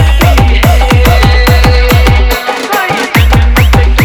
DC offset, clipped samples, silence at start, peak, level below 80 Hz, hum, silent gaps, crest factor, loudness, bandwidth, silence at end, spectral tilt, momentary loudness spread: under 0.1%; 0.4%; 0 s; 0 dBFS; -8 dBFS; none; none; 6 dB; -7 LUFS; 20 kHz; 0 s; -5.5 dB/octave; 4 LU